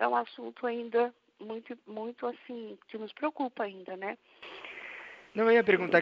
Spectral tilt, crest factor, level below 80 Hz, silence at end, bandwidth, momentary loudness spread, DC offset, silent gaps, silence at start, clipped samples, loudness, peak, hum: -7 dB/octave; 24 dB; -82 dBFS; 0 s; 6 kHz; 19 LU; under 0.1%; none; 0 s; under 0.1%; -32 LUFS; -8 dBFS; none